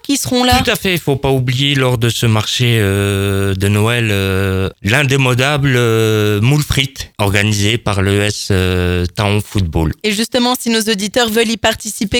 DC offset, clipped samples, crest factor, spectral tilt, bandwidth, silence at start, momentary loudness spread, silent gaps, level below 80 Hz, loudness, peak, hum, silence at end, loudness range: under 0.1%; under 0.1%; 14 dB; -4.5 dB/octave; 19.5 kHz; 0.05 s; 4 LU; none; -34 dBFS; -14 LUFS; 0 dBFS; none; 0 s; 2 LU